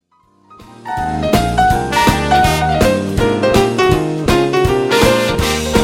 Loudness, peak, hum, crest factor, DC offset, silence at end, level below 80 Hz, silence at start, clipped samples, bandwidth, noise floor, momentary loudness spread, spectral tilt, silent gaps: -13 LUFS; 0 dBFS; none; 14 dB; under 0.1%; 0 s; -26 dBFS; 0.5 s; under 0.1%; 18.5 kHz; -53 dBFS; 4 LU; -5 dB/octave; none